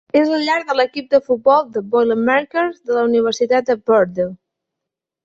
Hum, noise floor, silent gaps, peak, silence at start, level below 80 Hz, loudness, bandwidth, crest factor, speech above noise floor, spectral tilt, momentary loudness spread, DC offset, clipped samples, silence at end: none; -83 dBFS; none; -2 dBFS; 0.15 s; -60 dBFS; -17 LUFS; 7.8 kHz; 16 dB; 67 dB; -5 dB/octave; 5 LU; under 0.1%; under 0.1%; 0.9 s